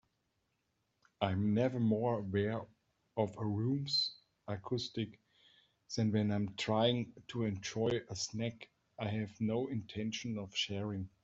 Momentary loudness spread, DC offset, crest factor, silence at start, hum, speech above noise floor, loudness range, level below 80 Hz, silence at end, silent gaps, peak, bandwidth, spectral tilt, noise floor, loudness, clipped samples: 11 LU; under 0.1%; 20 dB; 1.2 s; none; 46 dB; 3 LU; -72 dBFS; 0.15 s; none; -16 dBFS; 8 kHz; -5.5 dB/octave; -82 dBFS; -37 LUFS; under 0.1%